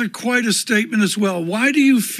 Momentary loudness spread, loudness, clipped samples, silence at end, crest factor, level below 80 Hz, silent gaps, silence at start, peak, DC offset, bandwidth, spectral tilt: 5 LU; -17 LUFS; under 0.1%; 0 s; 14 dB; -72 dBFS; none; 0 s; -4 dBFS; under 0.1%; 14.5 kHz; -3.5 dB/octave